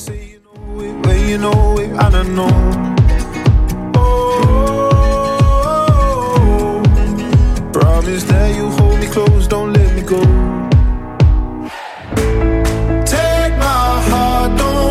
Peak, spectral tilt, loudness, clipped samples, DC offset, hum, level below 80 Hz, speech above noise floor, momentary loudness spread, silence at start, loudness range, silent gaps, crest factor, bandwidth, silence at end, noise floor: 0 dBFS; -6.5 dB/octave; -13 LUFS; under 0.1%; under 0.1%; none; -16 dBFS; 21 dB; 4 LU; 0 s; 2 LU; none; 10 dB; 14.5 kHz; 0 s; -32 dBFS